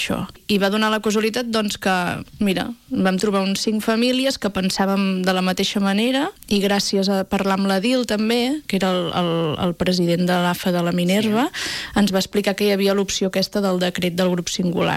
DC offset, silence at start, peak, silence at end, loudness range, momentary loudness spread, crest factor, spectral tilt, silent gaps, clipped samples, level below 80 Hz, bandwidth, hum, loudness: under 0.1%; 0 s; -6 dBFS; 0 s; 1 LU; 4 LU; 14 dB; -5 dB/octave; none; under 0.1%; -50 dBFS; 16 kHz; none; -20 LUFS